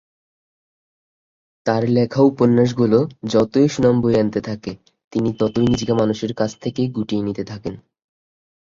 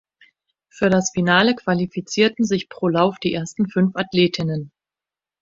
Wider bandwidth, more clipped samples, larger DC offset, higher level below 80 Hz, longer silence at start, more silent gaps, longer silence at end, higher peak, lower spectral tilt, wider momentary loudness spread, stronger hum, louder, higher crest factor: about the same, 7.6 kHz vs 7.8 kHz; neither; neither; first, -50 dBFS vs -56 dBFS; first, 1.65 s vs 0.75 s; first, 5.04-5.11 s vs none; first, 0.95 s vs 0.75 s; about the same, -2 dBFS vs -2 dBFS; first, -7 dB/octave vs -5 dB/octave; first, 12 LU vs 8 LU; neither; about the same, -19 LUFS vs -20 LUFS; about the same, 18 dB vs 20 dB